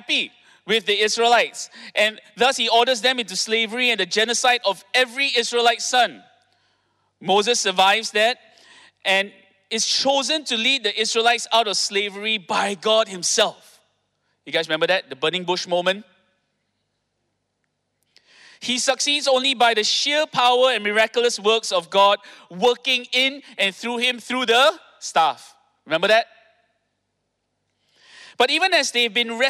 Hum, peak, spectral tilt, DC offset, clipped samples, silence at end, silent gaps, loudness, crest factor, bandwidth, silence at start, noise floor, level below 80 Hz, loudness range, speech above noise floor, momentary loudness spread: none; -6 dBFS; -1 dB/octave; under 0.1%; under 0.1%; 0 s; none; -19 LUFS; 14 dB; 16 kHz; 0.1 s; -75 dBFS; -74 dBFS; 6 LU; 54 dB; 7 LU